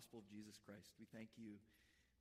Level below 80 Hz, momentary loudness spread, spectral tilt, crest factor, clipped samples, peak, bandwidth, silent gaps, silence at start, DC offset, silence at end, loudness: -86 dBFS; 4 LU; -5 dB/octave; 18 dB; under 0.1%; -44 dBFS; 15.5 kHz; none; 0 s; under 0.1%; 0 s; -61 LUFS